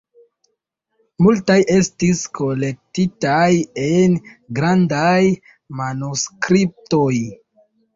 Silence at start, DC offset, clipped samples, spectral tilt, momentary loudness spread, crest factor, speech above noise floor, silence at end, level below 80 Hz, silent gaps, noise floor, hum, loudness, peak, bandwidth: 1.2 s; under 0.1%; under 0.1%; -5.5 dB/octave; 9 LU; 16 dB; 56 dB; 0.6 s; -52 dBFS; none; -73 dBFS; none; -17 LUFS; -2 dBFS; 7.8 kHz